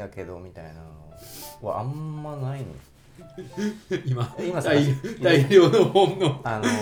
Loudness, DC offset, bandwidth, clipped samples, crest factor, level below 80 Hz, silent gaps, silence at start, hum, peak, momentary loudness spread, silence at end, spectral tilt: -22 LUFS; under 0.1%; 19.5 kHz; under 0.1%; 20 dB; -54 dBFS; none; 0 s; none; -4 dBFS; 24 LU; 0 s; -6 dB/octave